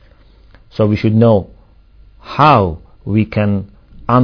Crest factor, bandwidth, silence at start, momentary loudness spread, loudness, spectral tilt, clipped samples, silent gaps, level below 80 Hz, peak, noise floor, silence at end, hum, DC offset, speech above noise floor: 14 dB; 5.4 kHz; 0.8 s; 19 LU; -14 LUFS; -9.5 dB/octave; 0.1%; none; -40 dBFS; 0 dBFS; -45 dBFS; 0 s; none; under 0.1%; 33 dB